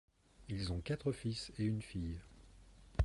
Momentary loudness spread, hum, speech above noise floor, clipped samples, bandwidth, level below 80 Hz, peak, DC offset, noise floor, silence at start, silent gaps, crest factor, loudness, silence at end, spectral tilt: 11 LU; none; 20 dB; under 0.1%; 11.5 kHz; -48 dBFS; -20 dBFS; under 0.1%; -60 dBFS; 0.4 s; none; 20 dB; -42 LUFS; 0 s; -6.5 dB/octave